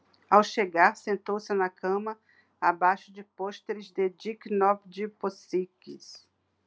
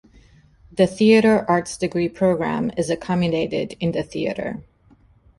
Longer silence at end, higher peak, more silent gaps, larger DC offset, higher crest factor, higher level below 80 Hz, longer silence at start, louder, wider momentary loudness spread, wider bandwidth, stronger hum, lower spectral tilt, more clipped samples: second, 0.5 s vs 0.75 s; second, -6 dBFS vs -2 dBFS; neither; neither; first, 24 dB vs 18 dB; second, -88 dBFS vs -52 dBFS; second, 0.3 s vs 0.75 s; second, -28 LUFS vs -20 LUFS; first, 18 LU vs 11 LU; second, 8 kHz vs 11.5 kHz; neither; about the same, -5 dB/octave vs -6 dB/octave; neither